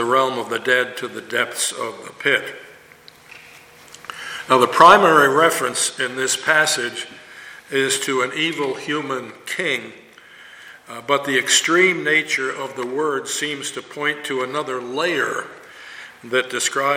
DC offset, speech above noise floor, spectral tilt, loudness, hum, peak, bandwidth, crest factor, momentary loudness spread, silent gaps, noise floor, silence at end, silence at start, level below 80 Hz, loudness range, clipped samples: under 0.1%; 27 dB; -2 dB/octave; -18 LUFS; none; 0 dBFS; 17 kHz; 20 dB; 20 LU; none; -47 dBFS; 0 s; 0 s; -66 dBFS; 9 LU; under 0.1%